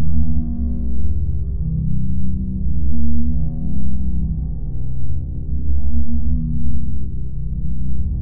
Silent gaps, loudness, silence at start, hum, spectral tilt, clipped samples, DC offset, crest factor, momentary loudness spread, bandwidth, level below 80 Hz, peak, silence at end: none; -24 LUFS; 0 s; none; -16 dB/octave; under 0.1%; under 0.1%; 10 dB; 5 LU; 1.3 kHz; -24 dBFS; -2 dBFS; 0 s